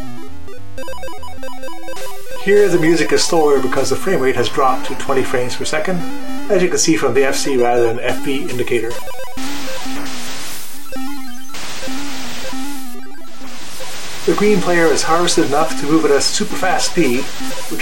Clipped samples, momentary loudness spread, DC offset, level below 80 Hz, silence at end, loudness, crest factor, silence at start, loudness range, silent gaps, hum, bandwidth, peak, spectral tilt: under 0.1%; 17 LU; 20%; -46 dBFS; 0 s; -17 LUFS; 16 dB; 0 s; 12 LU; none; none; 16.5 kHz; -2 dBFS; -3.5 dB/octave